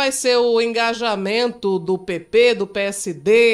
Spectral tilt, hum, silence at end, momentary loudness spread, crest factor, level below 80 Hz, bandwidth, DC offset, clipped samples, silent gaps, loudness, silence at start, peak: -3 dB/octave; none; 0 s; 8 LU; 14 dB; -58 dBFS; 14.5 kHz; under 0.1%; under 0.1%; none; -18 LUFS; 0 s; -4 dBFS